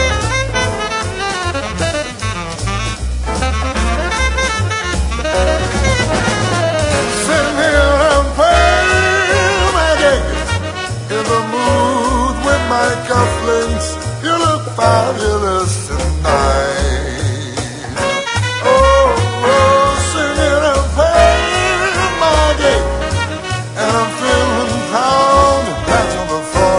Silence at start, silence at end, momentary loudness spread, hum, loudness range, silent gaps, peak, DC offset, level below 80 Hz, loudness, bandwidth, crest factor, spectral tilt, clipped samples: 0 s; 0 s; 9 LU; none; 5 LU; none; 0 dBFS; under 0.1%; -24 dBFS; -14 LUFS; 11 kHz; 14 dB; -4 dB/octave; under 0.1%